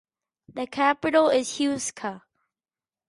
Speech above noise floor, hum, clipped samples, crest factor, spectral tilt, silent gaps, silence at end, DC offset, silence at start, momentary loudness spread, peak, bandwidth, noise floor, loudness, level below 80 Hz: over 66 dB; none; under 0.1%; 18 dB; -3 dB/octave; none; 0.9 s; under 0.1%; 0.5 s; 15 LU; -8 dBFS; 11.5 kHz; under -90 dBFS; -24 LUFS; -66 dBFS